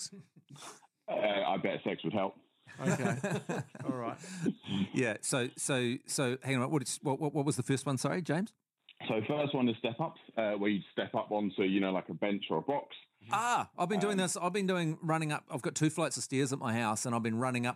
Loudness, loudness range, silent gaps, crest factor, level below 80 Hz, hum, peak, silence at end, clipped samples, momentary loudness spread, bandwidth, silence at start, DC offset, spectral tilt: -34 LUFS; 2 LU; none; 18 dB; -84 dBFS; none; -16 dBFS; 0 s; under 0.1%; 7 LU; 14.5 kHz; 0 s; under 0.1%; -5 dB/octave